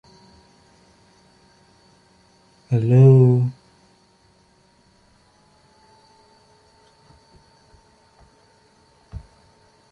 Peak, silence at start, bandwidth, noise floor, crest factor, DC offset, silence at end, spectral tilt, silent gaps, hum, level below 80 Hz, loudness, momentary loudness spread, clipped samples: -4 dBFS; 2.7 s; 4.9 kHz; -58 dBFS; 20 dB; under 0.1%; 0.75 s; -10.5 dB/octave; none; none; -56 dBFS; -16 LUFS; 30 LU; under 0.1%